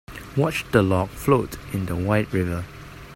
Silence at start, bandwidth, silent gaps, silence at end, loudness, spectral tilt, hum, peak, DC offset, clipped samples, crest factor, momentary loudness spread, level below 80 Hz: 0.1 s; 16.5 kHz; none; 0 s; -23 LUFS; -6.5 dB/octave; none; -2 dBFS; under 0.1%; under 0.1%; 22 dB; 10 LU; -44 dBFS